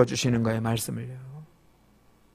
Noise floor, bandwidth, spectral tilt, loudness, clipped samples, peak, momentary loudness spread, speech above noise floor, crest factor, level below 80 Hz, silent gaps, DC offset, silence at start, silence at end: -60 dBFS; 15.5 kHz; -5.5 dB/octave; -27 LUFS; under 0.1%; -6 dBFS; 20 LU; 34 dB; 22 dB; -56 dBFS; none; under 0.1%; 0 s; 0.9 s